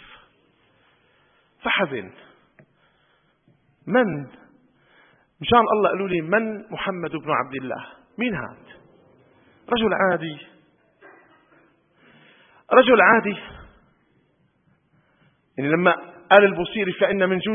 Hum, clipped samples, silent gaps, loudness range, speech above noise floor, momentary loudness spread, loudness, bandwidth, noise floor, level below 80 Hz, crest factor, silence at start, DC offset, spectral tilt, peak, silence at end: none; under 0.1%; none; 8 LU; 44 dB; 19 LU; -20 LUFS; 3.7 kHz; -64 dBFS; -58 dBFS; 24 dB; 1.65 s; under 0.1%; -9 dB/octave; 0 dBFS; 0 s